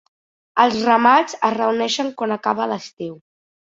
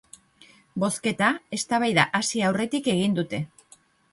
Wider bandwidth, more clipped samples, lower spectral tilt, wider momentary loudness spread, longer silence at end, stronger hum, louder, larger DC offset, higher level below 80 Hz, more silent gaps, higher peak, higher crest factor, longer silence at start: second, 7.8 kHz vs 11.5 kHz; neither; about the same, -3.5 dB/octave vs -4 dB/octave; first, 14 LU vs 10 LU; second, 0.45 s vs 0.65 s; neither; first, -18 LUFS vs -24 LUFS; neither; about the same, -66 dBFS vs -64 dBFS; first, 2.93-2.97 s vs none; about the same, -2 dBFS vs -4 dBFS; about the same, 18 dB vs 22 dB; second, 0.55 s vs 0.75 s